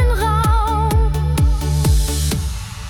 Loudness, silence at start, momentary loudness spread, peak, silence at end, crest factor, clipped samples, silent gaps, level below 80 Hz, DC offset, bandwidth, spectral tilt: -18 LUFS; 0 s; 4 LU; -6 dBFS; 0 s; 10 dB; under 0.1%; none; -18 dBFS; under 0.1%; 18 kHz; -5.5 dB/octave